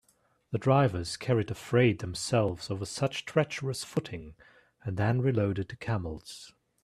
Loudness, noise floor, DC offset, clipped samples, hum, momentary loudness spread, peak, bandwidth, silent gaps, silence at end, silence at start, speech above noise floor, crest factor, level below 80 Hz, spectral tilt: -30 LUFS; -70 dBFS; under 0.1%; under 0.1%; none; 15 LU; -10 dBFS; 13.5 kHz; none; 0.35 s; 0.5 s; 40 dB; 20 dB; -58 dBFS; -6 dB/octave